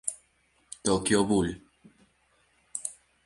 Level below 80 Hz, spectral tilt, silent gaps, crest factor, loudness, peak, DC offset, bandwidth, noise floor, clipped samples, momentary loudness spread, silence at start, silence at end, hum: -54 dBFS; -4 dB/octave; none; 22 dB; -28 LUFS; -10 dBFS; under 0.1%; 11.5 kHz; -68 dBFS; under 0.1%; 22 LU; 0.05 s; 0.35 s; none